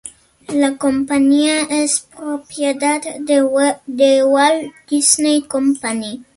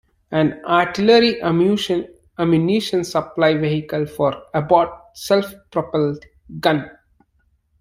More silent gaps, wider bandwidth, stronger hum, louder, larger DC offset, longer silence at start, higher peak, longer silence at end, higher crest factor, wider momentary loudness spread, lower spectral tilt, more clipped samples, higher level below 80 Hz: neither; second, 12 kHz vs 16 kHz; neither; first, -16 LUFS vs -19 LUFS; neither; second, 0.05 s vs 0.3 s; about the same, 0 dBFS vs -2 dBFS; second, 0.15 s vs 0.9 s; about the same, 16 dB vs 18 dB; about the same, 10 LU vs 10 LU; second, -2 dB/octave vs -6 dB/octave; neither; about the same, -58 dBFS vs -54 dBFS